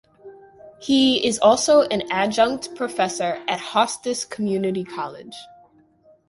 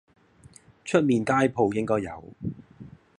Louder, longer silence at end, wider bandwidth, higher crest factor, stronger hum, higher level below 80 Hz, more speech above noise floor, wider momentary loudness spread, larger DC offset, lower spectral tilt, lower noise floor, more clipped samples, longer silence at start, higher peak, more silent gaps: first, -20 LUFS vs -25 LUFS; first, 0.85 s vs 0.3 s; about the same, 11.5 kHz vs 11.5 kHz; about the same, 20 dB vs 20 dB; neither; about the same, -60 dBFS vs -58 dBFS; first, 35 dB vs 29 dB; about the same, 15 LU vs 15 LU; neither; second, -3.5 dB/octave vs -6.5 dB/octave; about the same, -56 dBFS vs -54 dBFS; neither; second, 0.25 s vs 0.85 s; first, -2 dBFS vs -6 dBFS; neither